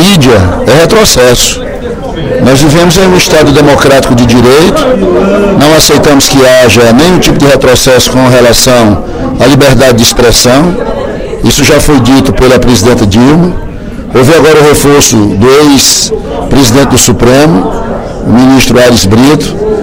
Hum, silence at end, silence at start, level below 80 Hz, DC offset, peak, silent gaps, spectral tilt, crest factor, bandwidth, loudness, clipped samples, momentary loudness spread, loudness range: none; 0 s; 0 s; -18 dBFS; under 0.1%; 0 dBFS; none; -4.5 dB/octave; 4 dB; over 20 kHz; -4 LUFS; 10%; 9 LU; 2 LU